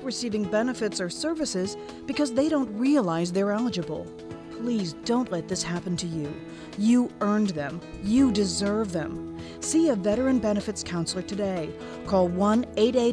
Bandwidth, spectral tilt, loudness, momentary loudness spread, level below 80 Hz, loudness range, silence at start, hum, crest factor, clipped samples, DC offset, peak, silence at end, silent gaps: 11 kHz; -5 dB/octave; -26 LUFS; 12 LU; -52 dBFS; 3 LU; 0 s; none; 16 dB; under 0.1%; under 0.1%; -10 dBFS; 0 s; none